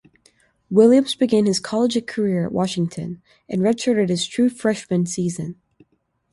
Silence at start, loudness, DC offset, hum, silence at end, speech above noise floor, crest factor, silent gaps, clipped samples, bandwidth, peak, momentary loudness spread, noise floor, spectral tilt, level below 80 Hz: 0.7 s; -20 LUFS; under 0.1%; none; 0.8 s; 45 dB; 18 dB; none; under 0.1%; 11.5 kHz; -2 dBFS; 13 LU; -64 dBFS; -5.5 dB/octave; -60 dBFS